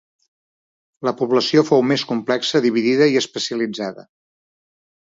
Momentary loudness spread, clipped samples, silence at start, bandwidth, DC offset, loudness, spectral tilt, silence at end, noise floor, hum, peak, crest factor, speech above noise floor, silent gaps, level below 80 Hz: 10 LU; under 0.1%; 1 s; 7.8 kHz; under 0.1%; -18 LUFS; -5 dB/octave; 1.1 s; under -90 dBFS; none; 0 dBFS; 20 dB; over 72 dB; none; -70 dBFS